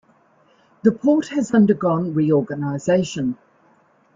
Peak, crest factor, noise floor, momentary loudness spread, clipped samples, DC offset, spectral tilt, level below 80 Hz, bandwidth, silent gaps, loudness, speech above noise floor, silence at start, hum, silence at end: -2 dBFS; 18 dB; -57 dBFS; 9 LU; under 0.1%; under 0.1%; -7 dB/octave; -60 dBFS; 7.6 kHz; none; -19 LUFS; 39 dB; 0.85 s; none; 0.8 s